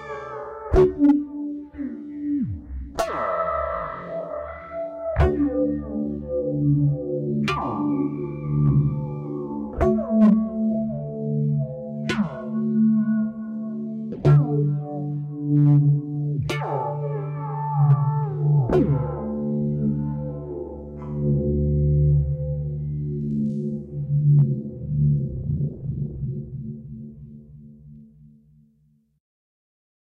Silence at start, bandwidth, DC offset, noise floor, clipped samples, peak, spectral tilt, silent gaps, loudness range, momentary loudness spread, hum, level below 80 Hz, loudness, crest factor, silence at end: 0 s; 7 kHz; under 0.1%; -62 dBFS; under 0.1%; -8 dBFS; -9.5 dB/octave; none; 6 LU; 14 LU; none; -38 dBFS; -23 LUFS; 14 dB; 2.1 s